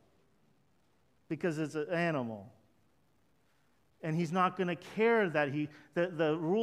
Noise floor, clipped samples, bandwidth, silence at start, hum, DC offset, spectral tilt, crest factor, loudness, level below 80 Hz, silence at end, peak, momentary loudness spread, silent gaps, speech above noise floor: -73 dBFS; under 0.1%; 12.5 kHz; 1.3 s; none; under 0.1%; -7 dB/octave; 20 dB; -33 LUFS; -80 dBFS; 0 s; -16 dBFS; 10 LU; none; 40 dB